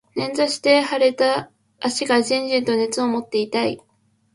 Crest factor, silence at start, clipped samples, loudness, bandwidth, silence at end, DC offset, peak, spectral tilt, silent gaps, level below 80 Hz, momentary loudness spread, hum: 18 dB; 0.15 s; under 0.1%; -20 LUFS; 11.5 kHz; 0.55 s; under 0.1%; -4 dBFS; -3 dB/octave; none; -66 dBFS; 9 LU; none